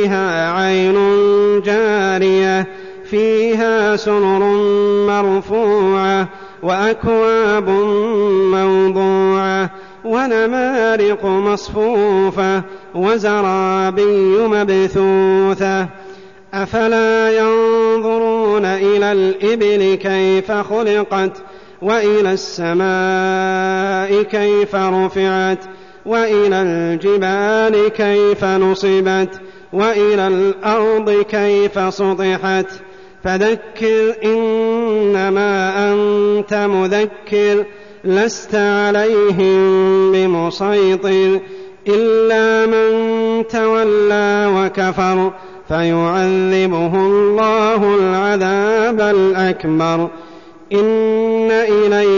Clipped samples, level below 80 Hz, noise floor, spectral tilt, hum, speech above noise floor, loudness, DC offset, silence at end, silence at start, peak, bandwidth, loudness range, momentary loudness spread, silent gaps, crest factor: under 0.1%; -50 dBFS; -38 dBFS; -6 dB/octave; none; 24 dB; -14 LUFS; 0.5%; 0 s; 0 s; -4 dBFS; 7.4 kHz; 2 LU; 5 LU; none; 10 dB